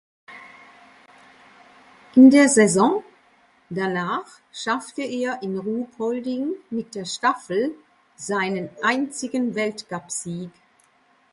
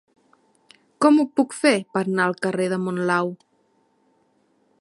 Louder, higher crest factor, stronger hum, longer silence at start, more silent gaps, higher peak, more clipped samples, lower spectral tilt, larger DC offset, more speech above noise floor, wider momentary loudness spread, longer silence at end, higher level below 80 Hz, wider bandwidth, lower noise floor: about the same, -22 LUFS vs -21 LUFS; about the same, 22 dB vs 20 dB; neither; second, 0.3 s vs 1 s; neither; about the same, -2 dBFS vs -4 dBFS; neither; about the same, -4.5 dB/octave vs -5.5 dB/octave; neither; second, 39 dB vs 44 dB; first, 18 LU vs 7 LU; second, 0.85 s vs 1.45 s; first, -68 dBFS vs -74 dBFS; about the same, 11.5 kHz vs 11.5 kHz; second, -60 dBFS vs -65 dBFS